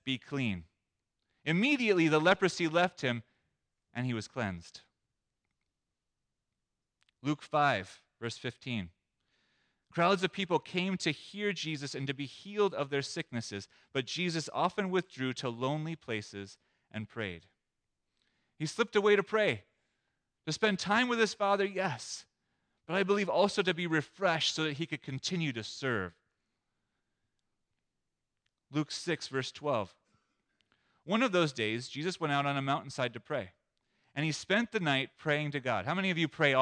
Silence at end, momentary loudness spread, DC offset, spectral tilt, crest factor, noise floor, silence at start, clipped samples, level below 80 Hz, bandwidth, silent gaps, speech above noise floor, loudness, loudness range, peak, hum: 0 s; 13 LU; under 0.1%; -5 dB/octave; 22 dB; -87 dBFS; 0.05 s; under 0.1%; -74 dBFS; 10.5 kHz; none; 55 dB; -32 LUFS; 10 LU; -12 dBFS; none